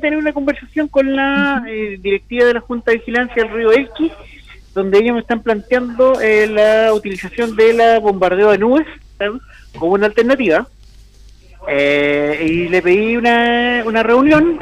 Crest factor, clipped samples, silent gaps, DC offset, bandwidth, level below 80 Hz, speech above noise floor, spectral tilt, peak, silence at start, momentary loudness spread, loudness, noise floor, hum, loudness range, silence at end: 12 dB; under 0.1%; none; under 0.1%; 12 kHz; -42 dBFS; 28 dB; -6 dB/octave; -4 dBFS; 0 s; 10 LU; -14 LUFS; -42 dBFS; none; 4 LU; 0 s